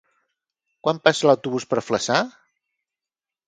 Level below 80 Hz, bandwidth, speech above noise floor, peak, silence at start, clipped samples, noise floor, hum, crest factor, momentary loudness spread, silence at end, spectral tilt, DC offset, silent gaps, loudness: -66 dBFS; 9.4 kHz; over 70 dB; 0 dBFS; 0.85 s; under 0.1%; under -90 dBFS; none; 22 dB; 8 LU; 1.2 s; -4 dB/octave; under 0.1%; none; -21 LUFS